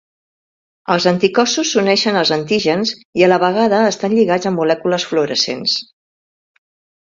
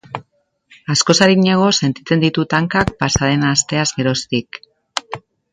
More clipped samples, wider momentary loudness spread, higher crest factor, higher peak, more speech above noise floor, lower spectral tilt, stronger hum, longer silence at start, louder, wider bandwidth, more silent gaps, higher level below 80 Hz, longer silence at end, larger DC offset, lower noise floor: neither; second, 5 LU vs 20 LU; about the same, 16 dB vs 16 dB; about the same, 0 dBFS vs 0 dBFS; first, over 75 dB vs 43 dB; about the same, -4 dB/octave vs -4 dB/octave; neither; first, 0.9 s vs 0.15 s; about the same, -15 LUFS vs -15 LUFS; second, 7.6 kHz vs 10.5 kHz; first, 3.05-3.13 s vs none; second, -58 dBFS vs -40 dBFS; first, 1.2 s vs 0.35 s; neither; first, under -90 dBFS vs -58 dBFS